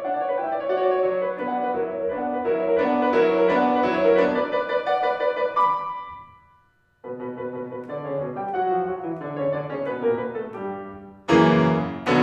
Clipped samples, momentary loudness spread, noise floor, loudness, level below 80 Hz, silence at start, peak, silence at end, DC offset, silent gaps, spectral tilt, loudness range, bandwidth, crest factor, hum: under 0.1%; 14 LU; -61 dBFS; -23 LUFS; -60 dBFS; 0 s; -6 dBFS; 0 s; under 0.1%; none; -7 dB/octave; 8 LU; 8 kHz; 18 dB; none